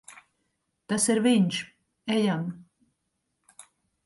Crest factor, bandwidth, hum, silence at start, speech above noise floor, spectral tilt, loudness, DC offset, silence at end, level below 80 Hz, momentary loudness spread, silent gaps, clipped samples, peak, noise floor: 18 dB; 11.5 kHz; none; 0.1 s; 54 dB; -4.5 dB/octave; -26 LUFS; under 0.1%; 0.45 s; -72 dBFS; 18 LU; none; under 0.1%; -12 dBFS; -79 dBFS